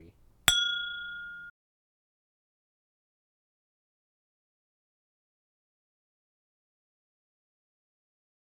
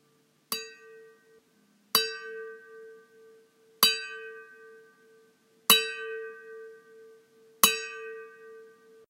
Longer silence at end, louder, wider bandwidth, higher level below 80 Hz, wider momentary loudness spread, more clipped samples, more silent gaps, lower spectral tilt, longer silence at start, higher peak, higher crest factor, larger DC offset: first, 7 s vs 0.4 s; about the same, -27 LUFS vs -26 LUFS; first, 19 kHz vs 16 kHz; first, -62 dBFS vs -86 dBFS; second, 19 LU vs 26 LU; neither; neither; about the same, 0.5 dB/octave vs 0.5 dB/octave; second, 0 s vs 0.5 s; about the same, -2 dBFS vs 0 dBFS; about the same, 38 dB vs 34 dB; neither